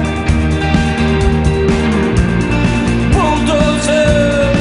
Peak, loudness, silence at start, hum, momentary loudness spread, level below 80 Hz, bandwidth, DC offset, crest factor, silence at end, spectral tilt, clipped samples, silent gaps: 0 dBFS; -13 LUFS; 0 s; none; 3 LU; -20 dBFS; 11 kHz; under 0.1%; 12 dB; 0 s; -6 dB/octave; under 0.1%; none